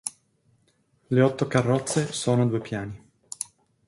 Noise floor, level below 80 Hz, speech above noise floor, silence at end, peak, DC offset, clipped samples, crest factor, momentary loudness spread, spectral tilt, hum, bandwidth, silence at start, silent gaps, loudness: -67 dBFS; -60 dBFS; 43 dB; 0.45 s; -6 dBFS; under 0.1%; under 0.1%; 20 dB; 15 LU; -5.5 dB/octave; none; 11.5 kHz; 0.05 s; none; -25 LUFS